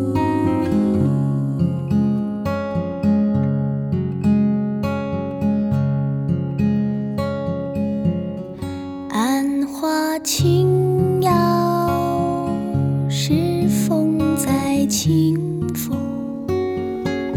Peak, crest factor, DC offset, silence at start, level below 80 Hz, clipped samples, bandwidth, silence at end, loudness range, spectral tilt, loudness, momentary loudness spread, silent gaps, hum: -6 dBFS; 14 dB; under 0.1%; 0 s; -46 dBFS; under 0.1%; 17.5 kHz; 0 s; 4 LU; -6.5 dB/octave; -20 LUFS; 7 LU; none; none